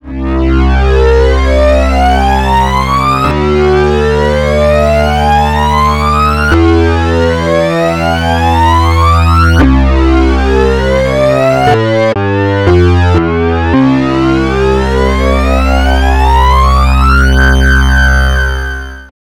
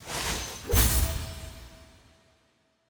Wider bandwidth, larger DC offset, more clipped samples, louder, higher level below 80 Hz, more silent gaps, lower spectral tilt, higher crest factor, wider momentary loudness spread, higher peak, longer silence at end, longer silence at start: second, 12.5 kHz vs over 20 kHz; neither; neither; first, -9 LUFS vs -27 LUFS; first, -12 dBFS vs -34 dBFS; neither; first, -6.5 dB/octave vs -3 dB/octave; second, 8 dB vs 22 dB; second, 3 LU vs 21 LU; first, 0 dBFS vs -8 dBFS; second, 0.3 s vs 1.05 s; about the same, 0.05 s vs 0 s